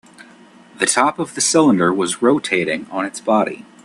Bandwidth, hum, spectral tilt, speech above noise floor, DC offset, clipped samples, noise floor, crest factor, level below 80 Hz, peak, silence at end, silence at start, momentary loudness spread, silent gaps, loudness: 12.5 kHz; none; -3.5 dB/octave; 28 dB; under 0.1%; under 0.1%; -45 dBFS; 18 dB; -62 dBFS; 0 dBFS; 0.25 s; 0.2 s; 9 LU; none; -17 LUFS